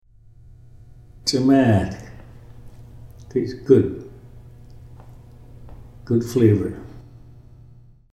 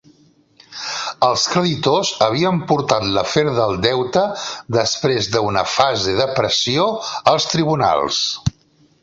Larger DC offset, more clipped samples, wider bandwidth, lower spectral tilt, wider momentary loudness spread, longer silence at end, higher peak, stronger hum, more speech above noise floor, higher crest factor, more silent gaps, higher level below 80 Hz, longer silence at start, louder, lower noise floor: neither; neither; first, 13.5 kHz vs 8 kHz; first, -6.5 dB/octave vs -4 dB/octave; first, 24 LU vs 6 LU; first, 1.1 s vs 0.5 s; about the same, -2 dBFS vs 0 dBFS; neither; second, 30 dB vs 38 dB; about the same, 22 dB vs 18 dB; neither; about the same, -46 dBFS vs -46 dBFS; first, 1.25 s vs 0.7 s; second, -20 LUFS vs -17 LUFS; second, -47 dBFS vs -55 dBFS